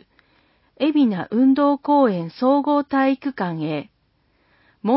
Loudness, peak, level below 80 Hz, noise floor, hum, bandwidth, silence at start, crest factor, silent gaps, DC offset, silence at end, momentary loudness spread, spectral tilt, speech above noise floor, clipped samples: -20 LUFS; -6 dBFS; -66 dBFS; -64 dBFS; none; 5.8 kHz; 0.8 s; 14 dB; none; under 0.1%; 0 s; 9 LU; -11.5 dB/octave; 45 dB; under 0.1%